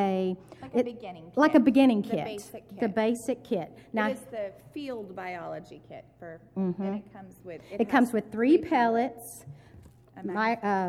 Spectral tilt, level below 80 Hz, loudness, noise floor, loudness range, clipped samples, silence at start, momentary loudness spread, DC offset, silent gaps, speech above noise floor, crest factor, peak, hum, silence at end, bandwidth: -6.5 dB/octave; -66 dBFS; -28 LUFS; -53 dBFS; 10 LU; under 0.1%; 0 s; 22 LU; under 0.1%; none; 25 dB; 22 dB; -8 dBFS; none; 0 s; 14.5 kHz